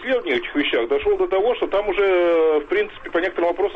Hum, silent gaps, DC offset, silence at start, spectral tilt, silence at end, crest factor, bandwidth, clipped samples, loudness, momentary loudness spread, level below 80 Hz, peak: none; none; under 0.1%; 0 s; -5.5 dB/octave; 0 s; 10 dB; 6 kHz; under 0.1%; -20 LUFS; 6 LU; -46 dBFS; -10 dBFS